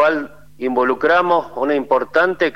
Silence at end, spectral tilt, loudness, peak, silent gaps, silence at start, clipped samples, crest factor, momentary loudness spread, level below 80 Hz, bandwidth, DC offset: 0.05 s; -6 dB/octave; -17 LUFS; -2 dBFS; none; 0 s; under 0.1%; 14 dB; 9 LU; -54 dBFS; 11.5 kHz; 0.8%